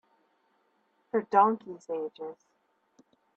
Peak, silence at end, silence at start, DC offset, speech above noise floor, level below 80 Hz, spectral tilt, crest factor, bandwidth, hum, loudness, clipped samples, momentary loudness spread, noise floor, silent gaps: -8 dBFS; 1.05 s; 1.15 s; under 0.1%; 44 dB; -84 dBFS; -7 dB/octave; 24 dB; 8 kHz; none; -28 LUFS; under 0.1%; 18 LU; -72 dBFS; none